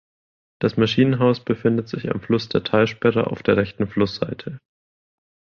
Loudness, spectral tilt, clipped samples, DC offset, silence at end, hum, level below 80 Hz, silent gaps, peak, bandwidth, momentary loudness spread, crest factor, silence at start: -21 LUFS; -7.5 dB/octave; under 0.1%; under 0.1%; 1 s; none; -52 dBFS; none; -4 dBFS; 7 kHz; 9 LU; 18 dB; 0.6 s